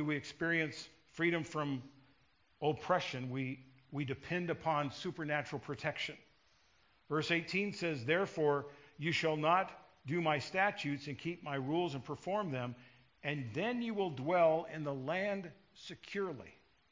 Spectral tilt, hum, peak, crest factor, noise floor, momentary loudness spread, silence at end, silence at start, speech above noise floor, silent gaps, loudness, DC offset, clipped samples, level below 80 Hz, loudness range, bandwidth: -6 dB/octave; none; -16 dBFS; 20 dB; -72 dBFS; 12 LU; 0.4 s; 0 s; 36 dB; none; -37 LUFS; under 0.1%; under 0.1%; -72 dBFS; 4 LU; 7.6 kHz